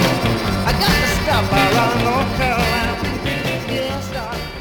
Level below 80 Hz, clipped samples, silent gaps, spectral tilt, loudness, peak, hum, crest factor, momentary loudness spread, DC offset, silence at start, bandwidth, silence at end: -30 dBFS; under 0.1%; none; -5 dB/octave; -18 LUFS; -2 dBFS; none; 16 dB; 8 LU; under 0.1%; 0 s; over 20 kHz; 0 s